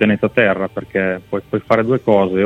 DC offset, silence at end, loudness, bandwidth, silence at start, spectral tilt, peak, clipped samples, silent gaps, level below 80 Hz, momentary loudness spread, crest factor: under 0.1%; 0 s; -17 LUFS; 6.8 kHz; 0 s; -8 dB/octave; 0 dBFS; under 0.1%; none; -50 dBFS; 8 LU; 16 dB